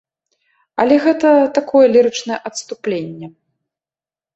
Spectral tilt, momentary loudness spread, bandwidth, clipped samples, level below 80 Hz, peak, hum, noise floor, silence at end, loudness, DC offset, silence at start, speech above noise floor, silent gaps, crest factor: -4.5 dB/octave; 16 LU; 8.2 kHz; under 0.1%; -62 dBFS; -2 dBFS; none; under -90 dBFS; 1.05 s; -14 LUFS; under 0.1%; 0.8 s; over 76 dB; none; 14 dB